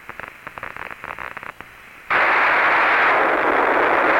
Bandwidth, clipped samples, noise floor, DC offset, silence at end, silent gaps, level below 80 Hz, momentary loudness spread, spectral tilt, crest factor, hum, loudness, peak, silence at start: 17 kHz; under 0.1%; -41 dBFS; under 0.1%; 0 s; none; -54 dBFS; 19 LU; -4 dB/octave; 14 dB; none; -16 LUFS; -4 dBFS; 0.1 s